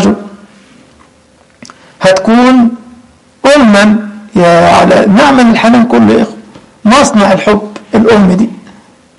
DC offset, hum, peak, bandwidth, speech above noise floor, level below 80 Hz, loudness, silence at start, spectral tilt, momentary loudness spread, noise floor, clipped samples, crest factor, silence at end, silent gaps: under 0.1%; none; 0 dBFS; 11.5 kHz; 39 dB; -38 dBFS; -6 LUFS; 0 s; -5.5 dB/octave; 9 LU; -44 dBFS; under 0.1%; 8 dB; 0.65 s; none